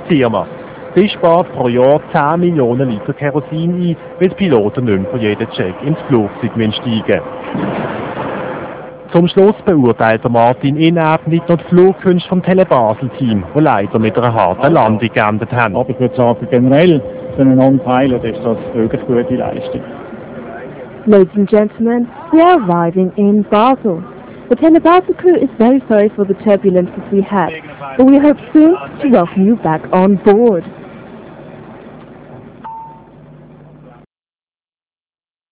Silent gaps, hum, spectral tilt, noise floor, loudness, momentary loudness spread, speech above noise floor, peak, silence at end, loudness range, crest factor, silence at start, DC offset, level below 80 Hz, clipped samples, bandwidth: none; none; -11.5 dB/octave; under -90 dBFS; -12 LUFS; 13 LU; over 79 dB; 0 dBFS; 2.6 s; 5 LU; 12 dB; 0 s; under 0.1%; -44 dBFS; 0.7%; 4 kHz